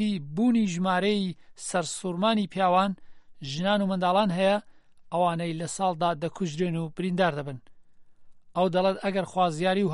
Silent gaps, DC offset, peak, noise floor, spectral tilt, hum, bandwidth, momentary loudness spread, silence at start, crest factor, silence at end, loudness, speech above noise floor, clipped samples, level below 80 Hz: none; under 0.1%; -10 dBFS; -49 dBFS; -5.5 dB/octave; none; 11.5 kHz; 10 LU; 0 s; 16 dB; 0 s; -27 LUFS; 24 dB; under 0.1%; -62 dBFS